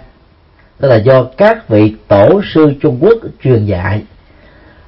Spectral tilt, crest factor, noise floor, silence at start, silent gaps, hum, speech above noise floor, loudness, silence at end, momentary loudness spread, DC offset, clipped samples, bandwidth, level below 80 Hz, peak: -10 dB/octave; 10 dB; -45 dBFS; 0.8 s; none; none; 36 dB; -10 LUFS; 0.8 s; 8 LU; under 0.1%; 0.2%; 5.8 kHz; -40 dBFS; 0 dBFS